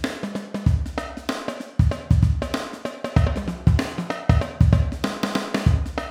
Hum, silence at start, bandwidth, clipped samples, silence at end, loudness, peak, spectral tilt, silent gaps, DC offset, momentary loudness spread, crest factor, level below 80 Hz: none; 0 s; 13.5 kHz; under 0.1%; 0 s; -23 LUFS; -2 dBFS; -7 dB/octave; none; under 0.1%; 10 LU; 18 dB; -28 dBFS